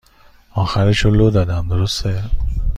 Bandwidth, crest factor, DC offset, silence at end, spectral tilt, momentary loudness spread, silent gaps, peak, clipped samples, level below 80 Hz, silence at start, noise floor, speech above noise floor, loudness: 11.5 kHz; 14 dB; under 0.1%; 0 s; -6.5 dB/octave; 9 LU; none; -2 dBFS; under 0.1%; -24 dBFS; 0.55 s; -48 dBFS; 33 dB; -17 LUFS